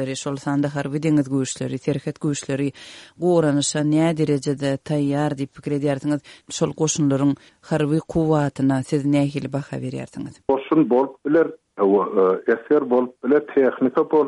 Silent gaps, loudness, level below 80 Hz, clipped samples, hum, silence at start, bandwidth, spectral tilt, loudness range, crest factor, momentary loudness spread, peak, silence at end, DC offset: none; -21 LUFS; -56 dBFS; under 0.1%; none; 0 s; 11.5 kHz; -6 dB/octave; 3 LU; 14 dB; 9 LU; -6 dBFS; 0 s; under 0.1%